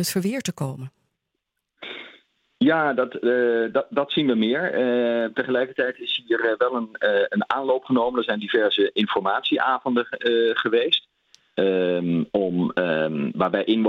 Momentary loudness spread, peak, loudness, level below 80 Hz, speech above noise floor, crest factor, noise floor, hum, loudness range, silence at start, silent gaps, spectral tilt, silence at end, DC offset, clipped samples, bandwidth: 6 LU; -4 dBFS; -22 LUFS; -68 dBFS; 58 dB; 20 dB; -80 dBFS; none; 3 LU; 0 s; none; -5 dB/octave; 0 s; under 0.1%; under 0.1%; 16.5 kHz